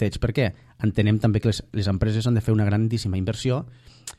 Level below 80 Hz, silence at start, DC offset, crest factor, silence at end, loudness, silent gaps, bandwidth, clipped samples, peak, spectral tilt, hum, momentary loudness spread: -40 dBFS; 0 s; under 0.1%; 16 dB; 0.05 s; -23 LUFS; none; 12.5 kHz; under 0.1%; -6 dBFS; -7 dB/octave; none; 6 LU